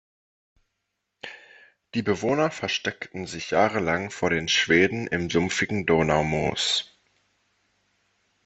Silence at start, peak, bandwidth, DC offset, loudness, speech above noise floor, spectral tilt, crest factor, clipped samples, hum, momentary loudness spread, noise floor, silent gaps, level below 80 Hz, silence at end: 1.25 s; -6 dBFS; 8.4 kHz; under 0.1%; -24 LUFS; 56 dB; -4 dB/octave; 22 dB; under 0.1%; none; 14 LU; -80 dBFS; none; -54 dBFS; 1.6 s